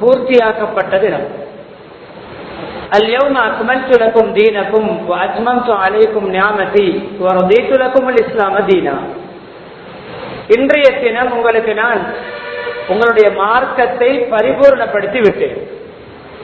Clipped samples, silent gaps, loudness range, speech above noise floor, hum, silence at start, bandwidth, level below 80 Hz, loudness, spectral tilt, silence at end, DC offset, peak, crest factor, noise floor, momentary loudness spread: 0.5%; none; 3 LU; 23 dB; none; 0 s; 6.8 kHz; -48 dBFS; -12 LUFS; -7 dB/octave; 0 s; under 0.1%; 0 dBFS; 12 dB; -34 dBFS; 19 LU